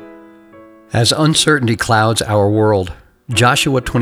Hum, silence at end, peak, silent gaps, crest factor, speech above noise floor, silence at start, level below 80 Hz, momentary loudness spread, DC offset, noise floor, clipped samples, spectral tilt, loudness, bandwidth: none; 0 s; 0 dBFS; none; 14 dB; 28 dB; 0 s; -40 dBFS; 7 LU; under 0.1%; -41 dBFS; under 0.1%; -4.5 dB/octave; -14 LUFS; 19 kHz